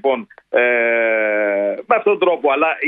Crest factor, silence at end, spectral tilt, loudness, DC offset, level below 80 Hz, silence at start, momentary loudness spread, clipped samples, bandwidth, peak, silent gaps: 16 dB; 0 s; -7.5 dB/octave; -16 LUFS; under 0.1%; -70 dBFS; 0.05 s; 6 LU; under 0.1%; 3.9 kHz; -2 dBFS; none